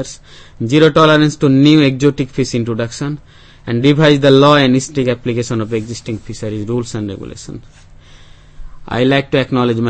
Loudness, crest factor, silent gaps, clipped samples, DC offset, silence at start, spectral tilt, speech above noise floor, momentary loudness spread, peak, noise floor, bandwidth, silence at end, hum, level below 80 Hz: -13 LUFS; 14 dB; none; 0.1%; under 0.1%; 0 s; -6 dB/octave; 26 dB; 17 LU; 0 dBFS; -39 dBFS; 8.8 kHz; 0 s; none; -40 dBFS